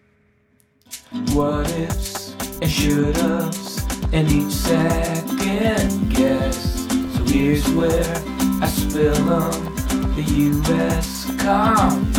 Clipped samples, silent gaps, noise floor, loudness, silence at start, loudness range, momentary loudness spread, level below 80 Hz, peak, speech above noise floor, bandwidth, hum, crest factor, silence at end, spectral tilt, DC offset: under 0.1%; none; -60 dBFS; -20 LUFS; 0.9 s; 2 LU; 7 LU; -28 dBFS; -4 dBFS; 41 dB; 18 kHz; none; 16 dB; 0 s; -5.5 dB/octave; under 0.1%